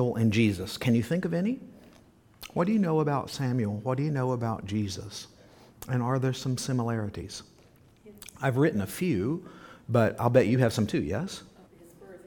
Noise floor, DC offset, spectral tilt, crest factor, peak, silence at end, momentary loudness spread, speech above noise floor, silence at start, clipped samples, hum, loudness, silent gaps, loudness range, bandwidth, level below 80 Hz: -58 dBFS; under 0.1%; -6.5 dB/octave; 22 dB; -6 dBFS; 0.05 s; 17 LU; 31 dB; 0 s; under 0.1%; none; -28 LUFS; none; 5 LU; 19 kHz; -58 dBFS